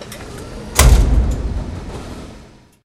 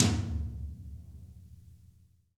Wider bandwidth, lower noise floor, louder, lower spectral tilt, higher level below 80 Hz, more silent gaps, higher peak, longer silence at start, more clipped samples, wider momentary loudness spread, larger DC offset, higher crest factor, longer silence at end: first, 16 kHz vs 13.5 kHz; second, -42 dBFS vs -62 dBFS; first, -16 LUFS vs -35 LUFS; about the same, -4.5 dB/octave vs -5 dB/octave; first, -18 dBFS vs -46 dBFS; neither; first, 0 dBFS vs -6 dBFS; about the same, 0 s vs 0 s; neither; about the same, 20 LU vs 22 LU; neither; second, 16 dB vs 28 dB; about the same, 0.45 s vs 0.55 s